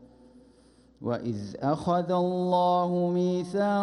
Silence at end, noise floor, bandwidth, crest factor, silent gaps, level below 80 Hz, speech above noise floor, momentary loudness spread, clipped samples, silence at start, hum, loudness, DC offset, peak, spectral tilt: 0 s; -58 dBFS; 11 kHz; 14 dB; none; -64 dBFS; 32 dB; 8 LU; under 0.1%; 0 s; none; -27 LUFS; under 0.1%; -14 dBFS; -8 dB/octave